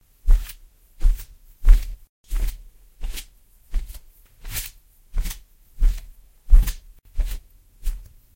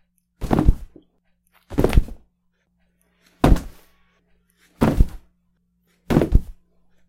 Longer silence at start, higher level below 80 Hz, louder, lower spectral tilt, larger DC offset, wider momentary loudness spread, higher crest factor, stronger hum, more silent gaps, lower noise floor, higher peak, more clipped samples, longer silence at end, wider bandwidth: second, 0.25 s vs 0.4 s; about the same, -22 dBFS vs -24 dBFS; second, -27 LUFS vs -21 LUFS; second, -4 dB/octave vs -7.5 dB/octave; neither; first, 21 LU vs 15 LU; about the same, 20 dB vs 22 dB; neither; first, 2.09-2.24 s vs none; second, -50 dBFS vs -68 dBFS; about the same, 0 dBFS vs 0 dBFS; neither; second, 0.35 s vs 0.55 s; about the same, 16.5 kHz vs 16 kHz